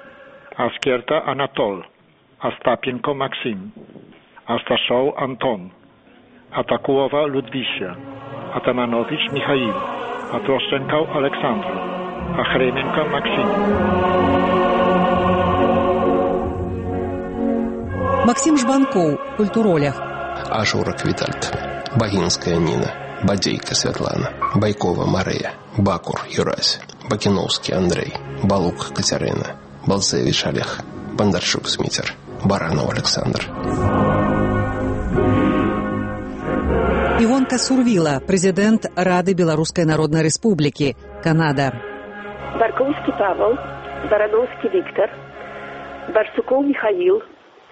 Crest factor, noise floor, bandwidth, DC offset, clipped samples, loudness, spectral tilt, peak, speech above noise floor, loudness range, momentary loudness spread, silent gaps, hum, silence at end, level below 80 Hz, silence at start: 18 dB; -51 dBFS; 8.8 kHz; under 0.1%; under 0.1%; -19 LUFS; -5 dB/octave; -2 dBFS; 32 dB; 5 LU; 10 LU; none; none; 0.45 s; -40 dBFS; 0 s